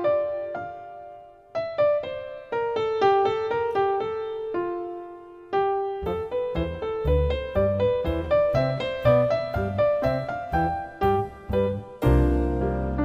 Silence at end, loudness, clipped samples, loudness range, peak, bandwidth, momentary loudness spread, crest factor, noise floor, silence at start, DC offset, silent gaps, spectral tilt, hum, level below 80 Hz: 0 s; -25 LUFS; under 0.1%; 4 LU; -8 dBFS; 15.5 kHz; 12 LU; 16 dB; -45 dBFS; 0 s; under 0.1%; none; -8.5 dB/octave; none; -34 dBFS